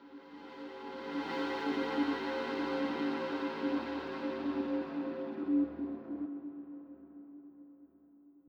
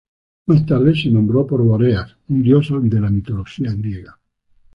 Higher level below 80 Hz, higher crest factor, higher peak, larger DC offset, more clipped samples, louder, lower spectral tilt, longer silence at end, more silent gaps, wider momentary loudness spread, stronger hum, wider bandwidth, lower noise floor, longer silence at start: second, -68 dBFS vs -40 dBFS; about the same, 16 dB vs 14 dB; second, -22 dBFS vs -2 dBFS; neither; neither; second, -36 LUFS vs -17 LUFS; second, -6 dB/octave vs -9.5 dB/octave; second, 0.1 s vs 0.7 s; neither; first, 19 LU vs 11 LU; neither; first, 7 kHz vs 5.6 kHz; first, -62 dBFS vs -54 dBFS; second, 0 s vs 0.5 s